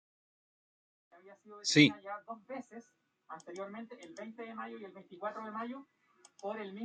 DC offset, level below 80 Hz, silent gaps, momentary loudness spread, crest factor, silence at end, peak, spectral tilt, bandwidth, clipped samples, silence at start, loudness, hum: under 0.1%; -80 dBFS; none; 24 LU; 28 dB; 0 s; -10 dBFS; -4 dB/octave; 9 kHz; under 0.1%; 1.15 s; -35 LUFS; none